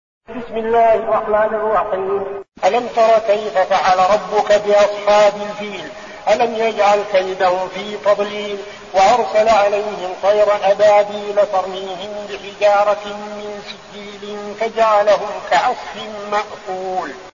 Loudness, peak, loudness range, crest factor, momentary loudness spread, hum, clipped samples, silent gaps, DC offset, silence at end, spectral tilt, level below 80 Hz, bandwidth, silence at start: -16 LUFS; -2 dBFS; 4 LU; 14 dB; 15 LU; none; under 0.1%; none; 0.2%; 0.05 s; -3.5 dB/octave; -52 dBFS; 7.4 kHz; 0.3 s